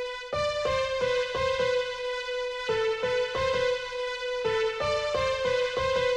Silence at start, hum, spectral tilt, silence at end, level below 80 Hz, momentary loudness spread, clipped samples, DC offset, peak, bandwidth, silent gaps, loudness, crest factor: 0 s; none; -3 dB/octave; 0 s; -50 dBFS; 5 LU; under 0.1%; under 0.1%; -14 dBFS; 10.5 kHz; none; -28 LUFS; 14 dB